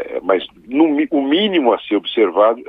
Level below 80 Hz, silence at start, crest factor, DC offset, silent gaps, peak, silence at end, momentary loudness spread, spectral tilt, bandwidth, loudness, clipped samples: -60 dBFS; 0 s; 16 dB; under 0.1%; none; 0 dBFS; 0.05 s; 5 LU; -8 dB/octave; 4 kHz; -16 LUFS; under 0.1%